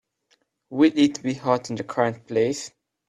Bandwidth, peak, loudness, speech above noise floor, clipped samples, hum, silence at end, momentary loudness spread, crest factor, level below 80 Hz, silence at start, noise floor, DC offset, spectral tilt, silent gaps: 10.5 kHz; -6 dBFS; -23 LUFS; 45 dB; under 0.1%; none; 0.4 s; 13 LU; 18 dB; -66 dBFS; 0.7 s; -68 dBFS; under 0.1%; -5.5 dB/octave; none